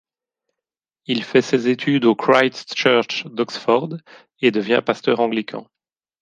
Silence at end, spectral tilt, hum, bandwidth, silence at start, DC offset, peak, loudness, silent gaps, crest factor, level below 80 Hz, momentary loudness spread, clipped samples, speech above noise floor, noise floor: 0.6 s; -5 dB/octave; none; 9.2 kHz; 1.1 s; under 0.1%; 0 dBFS; -19 LUFS; none; 20 dB; -68 dBFS; 11 LU; under 0.1%; 69 dB; -87 dBFS